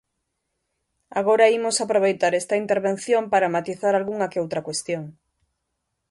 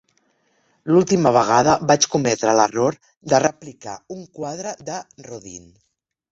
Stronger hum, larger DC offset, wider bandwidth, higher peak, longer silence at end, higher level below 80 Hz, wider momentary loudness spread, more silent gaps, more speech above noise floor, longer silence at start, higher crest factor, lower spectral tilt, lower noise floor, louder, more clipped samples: neither; neither; first, 11.5 kHz vs 8 kHz; about the same, -4 dBFS vs -2 dBFS; first, 1 s vs 0.75 s; second, -68 dBFS vs -56 dBFS; second, 10 LU vs 21 LU; second, none vs 3.17-3.21 s; first, 56 dB vs 45 dB; first, 1.15 s vs 0.85 s; about the same, 20 dB vs 18 dB; about the same, -4 dB/octave vs -4.5 dB/octave; first, -78 dBFS vs -64 dBFS; second, -22 LUFS vs -18 LUFS; neither